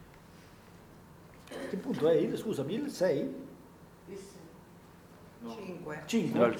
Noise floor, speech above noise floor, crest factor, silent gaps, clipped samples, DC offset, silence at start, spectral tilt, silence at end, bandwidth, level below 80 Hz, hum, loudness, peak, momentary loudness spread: -55 dBFS; 23 dB; 20 dB; none; under 0.1%; under 0.1%; 0 s; -6 dB/octave; 0 s; 20 kHz; -68 dBFS; none; -33 LUFS; -14 dBFS; 26 LU